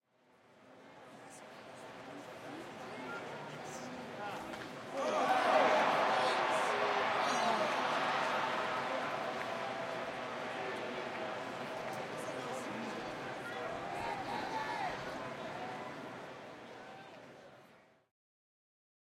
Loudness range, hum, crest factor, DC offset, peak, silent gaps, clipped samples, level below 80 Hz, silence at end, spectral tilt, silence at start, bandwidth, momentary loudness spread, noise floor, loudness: 16 LU; none; 20 dB; under 0.1%; -18 dBFS; none; under 0.1%; -76 dBFS; 1.3 s; -3.5 dB/octave; 0.55 s; 16 kHz; 19 LU; -68 dBFS; -37 LUFS